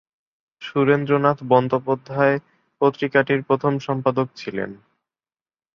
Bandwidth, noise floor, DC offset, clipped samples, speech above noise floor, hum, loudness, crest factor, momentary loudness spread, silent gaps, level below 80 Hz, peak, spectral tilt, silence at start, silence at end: 6.8 kHz; under -90 dBFS; under 0.1%; under 0.1%; over 70 dB; none; -21 LUFS; 20 dB; 10 LU; none; -64 dBFS; -2 dBFS; -8 dB/octave; 0.6 s; 1 s